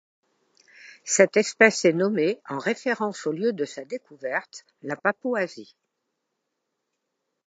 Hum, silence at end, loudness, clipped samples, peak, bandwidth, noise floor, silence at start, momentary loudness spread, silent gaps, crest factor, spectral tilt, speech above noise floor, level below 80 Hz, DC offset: none; 1.85 s; -24 LUFS; under 0.1%; -2 dBFS; 9.4 kHz; -80 dBFS; 0.85 s; 17 LU; none; 24 dB; -3.5 dB/octave; 56 dB; -82 dBFS; under 0.1%